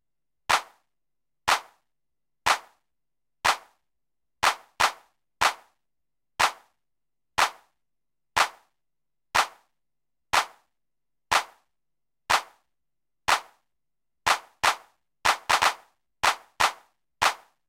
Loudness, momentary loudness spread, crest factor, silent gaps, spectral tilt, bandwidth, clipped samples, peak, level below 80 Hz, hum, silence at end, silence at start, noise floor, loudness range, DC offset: -26 LUFS; 7 LU; 24 dB; none; 0 dB/octave; 16.5 kHz; under 0.1%; -4 dBFS; -60 dBFS; none; 0.3 s; 0.5 s; -90 dBFS; 4 LU; under 0.1%